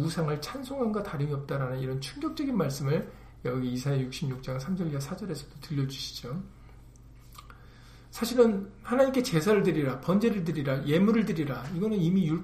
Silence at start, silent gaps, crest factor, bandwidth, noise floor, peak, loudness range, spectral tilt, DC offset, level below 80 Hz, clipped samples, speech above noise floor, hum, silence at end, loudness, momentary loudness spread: 0 s; none; 20 dB; 15.5 kHz; -51 dBFS; -8 dBFS; 9 LU; -6.5 dB/octave; under 0.1%; -52 dBFS; under 0.1%; 23 dB; none; 0 s; -29 LUFS; 12 LU